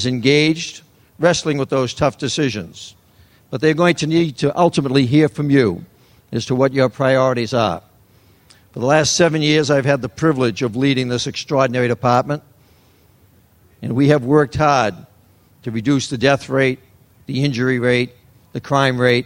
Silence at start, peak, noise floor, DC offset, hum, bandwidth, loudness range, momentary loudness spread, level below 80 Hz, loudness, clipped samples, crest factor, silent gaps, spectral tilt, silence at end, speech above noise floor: 0 s; 0 dBFS; -52 dBFS; under 0.1%; none; 16 kHz; 3 LU; 13 LU; -50 dBFS; -17 LUFS; under 0.1%; 18 dB; none; -5.5 dB/octave; 0 s; 36 dB